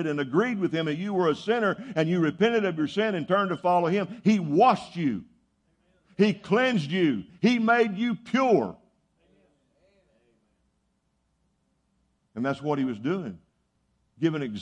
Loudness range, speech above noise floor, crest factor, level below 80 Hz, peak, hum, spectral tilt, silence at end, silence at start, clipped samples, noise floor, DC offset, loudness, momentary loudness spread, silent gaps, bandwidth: 9 LU; 48 dB; 18 dB; -70 dBFS; -8 dBFS; none; -7 dB/octave; 0 s; 0 s; under 0.1%; -73 dBFS; under 0.1%; -25 LUFS; 8 LU; none; 9.6 kHz